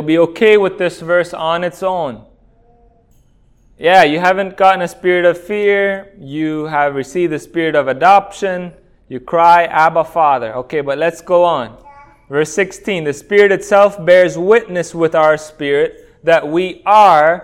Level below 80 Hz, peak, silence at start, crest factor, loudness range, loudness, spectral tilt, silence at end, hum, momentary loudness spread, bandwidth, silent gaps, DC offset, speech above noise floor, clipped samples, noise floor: -50 dBFS; 0 dBFS; 0 s; 14 dB; 4 LU; -13 LUFS; -5 dB/octave; 0 s; none; 11 LU; 14.5 kHz; none; under 0.1%; 38 dB; 0.2%; -50 dBFS